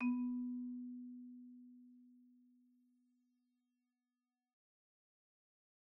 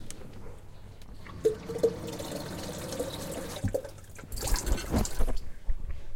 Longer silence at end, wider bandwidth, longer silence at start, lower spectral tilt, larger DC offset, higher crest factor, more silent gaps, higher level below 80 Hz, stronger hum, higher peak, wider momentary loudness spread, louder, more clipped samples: first, 3.6 s vs 0 s; second, 2.8 kHz vs 17 kHz; about the same, 0 s vs 0 s; second, -2.5 dB/octave vs -4.5 dB/octave; neither; about the same, 18 dB vs 18 dB; neither; second, under -90 dBFS vs -36 dBFS; neither; second, -30 dBFS vs -12 dBFS; first, 23 LU vs 18 LU; second, -45 LUFS vs -34 LUFS; neither